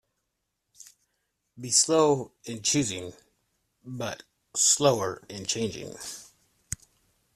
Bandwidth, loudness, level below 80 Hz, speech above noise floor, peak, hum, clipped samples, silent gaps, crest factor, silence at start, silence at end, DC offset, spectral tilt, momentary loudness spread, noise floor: 14.5 kHz; -25 LUFS; -62 dBFS; 54 dB; -8 dBFS; none; under 0.1%; none; 22 dB; 1.55 s; 1.1 s; under 0.1%; -3 dB/octave; 20 LU; -81 dBFS